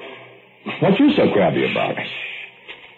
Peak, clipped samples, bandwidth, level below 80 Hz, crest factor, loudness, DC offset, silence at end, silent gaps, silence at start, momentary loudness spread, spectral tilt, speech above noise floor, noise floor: -6 dBFS; under 0.1%; 4.4 kHz; -56 dBFS; 14 dB; -18 LUFS; under 0.1%; 0.1 s; none; 0 s; 21 LU; -8.5 dB/octave; 27 dB; -44 dBFS